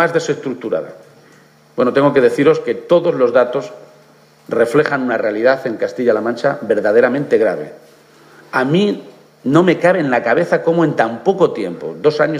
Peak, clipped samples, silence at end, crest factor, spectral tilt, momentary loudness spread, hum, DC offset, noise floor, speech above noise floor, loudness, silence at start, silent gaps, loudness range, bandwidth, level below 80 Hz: 0 dBFS; under 0.1%; 0 s; 16 dB; -6.5 dB/octave; 10 LU; none; under 0.1%; -47 dBFS; 33 dB; -15 LUFS; 0 s; none; 2 LU; 11.5 kHz; -66 dBFS